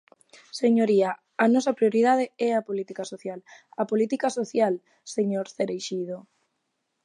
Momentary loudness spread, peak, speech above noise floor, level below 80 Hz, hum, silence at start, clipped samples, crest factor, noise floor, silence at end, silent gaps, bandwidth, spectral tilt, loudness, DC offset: 14 LU; -8 dBFS; 53 dB; -80 dBFS; none; 0.55 s; under 0.1%; 18 dB; -77 dBFS; 0.85 s; none; 11 kHz; -5.5 dB/octave; -25 LUFS; under 0.1%